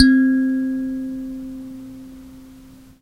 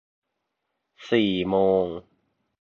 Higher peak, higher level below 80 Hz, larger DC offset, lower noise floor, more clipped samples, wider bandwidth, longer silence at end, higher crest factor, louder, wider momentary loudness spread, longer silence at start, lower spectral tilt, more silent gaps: first, 0 dBFS vs -8 dBFS; first, -48 dBFS vs -58 dBFS; neither; second, -44 dBFS vs -80 dBFS; neither; first, 9.4 kHz vs 6.8 kHz; second, 0.35 s vs 0.6 s; about the same, 20 dB vs 20 dB; first, -20 LUFS vs -23 LUFS; first, 24 LU vs 10 LU; second, 0 s vs 1 s; second, -5.5 dB/octave vs -7 dB/octave; neither